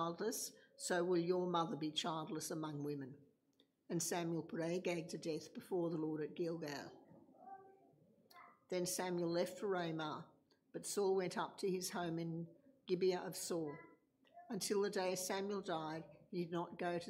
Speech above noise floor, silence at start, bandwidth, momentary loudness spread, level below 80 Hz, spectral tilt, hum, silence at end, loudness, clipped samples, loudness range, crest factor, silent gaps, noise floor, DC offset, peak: 36 dB; 0 s; 16 kHz; 13 LU; -88 dBFS; -4.5 dB/octave; none; 0 s; -42 LUFS; under 0.1%; 4 LU; 18 dB; none; -78 dBFS; under 0.1%; -26 dBFS